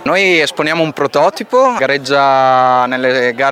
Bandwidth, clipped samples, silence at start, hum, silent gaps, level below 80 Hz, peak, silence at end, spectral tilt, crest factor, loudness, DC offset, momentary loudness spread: 15.5 kHz; under 0.1%; 0 s; none; none; -60 dBFS; 0 dBFS; 0 s; -4 dB/octave; 12 dB; -12 LUFS; under 0.1%; 5 LU